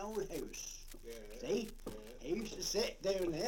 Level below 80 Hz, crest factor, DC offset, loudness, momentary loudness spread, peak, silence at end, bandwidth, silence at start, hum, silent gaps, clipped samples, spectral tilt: -54 dBFS; 18 dB; under 0.1%; -41 LUFS; 14 LU; -22 dBFS; 0 s; 17 kHz; 0 s; none; none; under 0.1%; -3.5 dB/octave